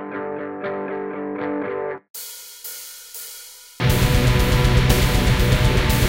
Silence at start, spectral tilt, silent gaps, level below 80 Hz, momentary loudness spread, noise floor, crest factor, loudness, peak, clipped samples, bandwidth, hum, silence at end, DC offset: 0 s; -5 dB/octave; 2.10-2.14 s; -26 dBFS; 16 LU; -40 dBFS; 18 dB; -20 LUFS; -2 dBFS; under 0.1%; 17 kHz; none; 0 s; under 0.1%